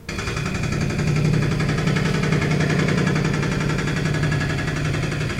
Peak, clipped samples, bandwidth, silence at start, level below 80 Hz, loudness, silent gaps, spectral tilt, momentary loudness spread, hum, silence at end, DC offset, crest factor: -6 dBFS; under 0.1%; 12.5 kHz; 0 s; -36 dBFS; -21 LUFS; none; -6 dB/octave; 4 LU; none; 0 s; under 0.1%; 14 dB